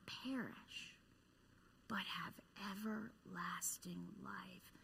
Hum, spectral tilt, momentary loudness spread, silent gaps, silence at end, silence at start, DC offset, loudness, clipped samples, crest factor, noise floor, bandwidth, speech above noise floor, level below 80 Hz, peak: none; -3 dB/octave; 10 LU; none; 0 s; 0 s; under 0.1%; -48 LUFS; under 0.1%; 20 dB; -71 dBFS; 15.5 kHz; 22 dB; -78 dBFS; -30 dBFS